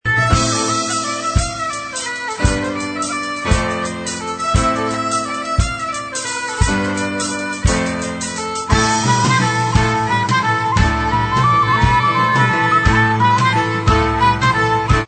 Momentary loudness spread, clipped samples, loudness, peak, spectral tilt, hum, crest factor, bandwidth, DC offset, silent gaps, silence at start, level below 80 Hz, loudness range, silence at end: 8 LU; under 0.1%; -16 LUFS; 0 dBFS; -4 dB/octave; none; 16 dB; 9.2 kHz; under 0.1%; none; 0.05 s; -26 dBFS; 5 LU; 0 s